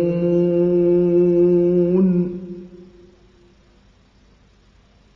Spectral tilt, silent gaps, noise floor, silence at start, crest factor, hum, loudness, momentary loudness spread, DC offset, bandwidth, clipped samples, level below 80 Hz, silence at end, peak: -11.5 dB/octave; none; -53 dBFS; 0 s; 12 dB; 50 Hz at -50 dBFS; -17 LUFS; 14 LU; under 0.1%; 3.1 kHz; under 0.1%; -50 dBFS; 2.35 s; -8 dBFS